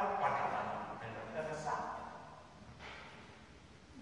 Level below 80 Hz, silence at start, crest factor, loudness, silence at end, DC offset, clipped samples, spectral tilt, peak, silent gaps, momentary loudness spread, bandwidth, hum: -68 dBFS; 0 s; 20 dB; -41 LUFS; 0 s; under 0.1%; under 0.1%; -5 dB/octave; -22 dBFS; none; 22 LU; 11 kHz; none